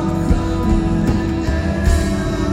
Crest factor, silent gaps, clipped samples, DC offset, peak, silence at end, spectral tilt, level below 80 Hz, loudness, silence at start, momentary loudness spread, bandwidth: 14 dB; none; under 0.1%; under 0.1%; -2 dBFS; 0 s; -7 dB/octave; -20 dBFS; -18 LUFS; 0 s; 2 LU; 15 kHz